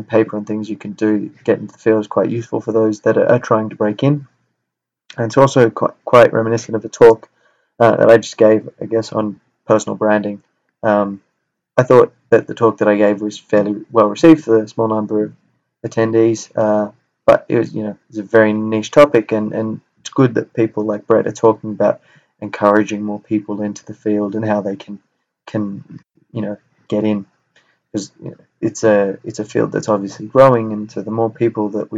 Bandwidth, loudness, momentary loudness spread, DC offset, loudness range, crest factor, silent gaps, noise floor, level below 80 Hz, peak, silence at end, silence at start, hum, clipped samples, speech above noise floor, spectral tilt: 9 kHz; -15 LUFS; 15 LU; under 0.1%; 9 LU; 16 dB; none; -79 dBFS; -56 dBFS; 0 dBFS; 0 s; 0 s; none; 0.2%; 64 dB; -6.5 dB/octave